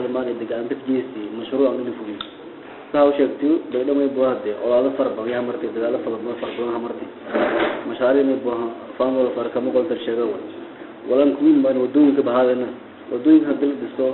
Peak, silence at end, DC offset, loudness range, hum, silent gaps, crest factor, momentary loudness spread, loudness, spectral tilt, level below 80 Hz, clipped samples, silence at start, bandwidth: -4 dBFS; 0 s; under 0.1%; 5 LU; none; none; 16 dB; 14 LU; -20 LUFS; -10.5 dB/octave; -62 dBFS; under 0.1%; 0 s; 4.2 kHz